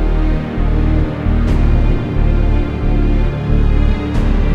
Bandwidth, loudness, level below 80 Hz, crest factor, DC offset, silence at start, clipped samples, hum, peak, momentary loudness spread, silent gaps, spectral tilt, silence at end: 5.2 kHz; -16 LUFS; -14 dBFS; 12 dB; under 0.1%; 0 s; under 0.1%; none; -2 dBFS; 3 LU; none; -9 dB/octave; 0 s